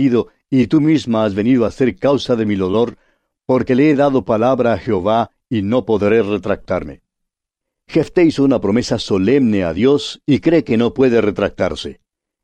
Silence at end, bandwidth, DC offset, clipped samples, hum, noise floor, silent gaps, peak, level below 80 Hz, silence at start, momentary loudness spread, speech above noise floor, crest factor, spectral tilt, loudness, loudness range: 0.5 s; 9.4 kHz; under 0.1%; under 0.1%; none; -81 dBFS; none; -2 dBFS; -44 dBFS; 0 s; 7 LU; 66 dB; 12 dB; -7 dB/octave; -16 LUFS; 3 LU